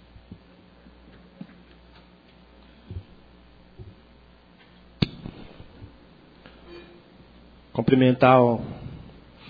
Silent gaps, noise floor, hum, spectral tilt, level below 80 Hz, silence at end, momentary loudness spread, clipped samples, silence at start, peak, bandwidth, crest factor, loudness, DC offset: none; -53 dBFS; none; -9.5 dB/octave; -52 dBFS; 0.5 s; 31 LU; under 0.1%; 2.9 s; -4 dBFS; 5 kHz; 24 dB; -21 LUFS; under 0.1%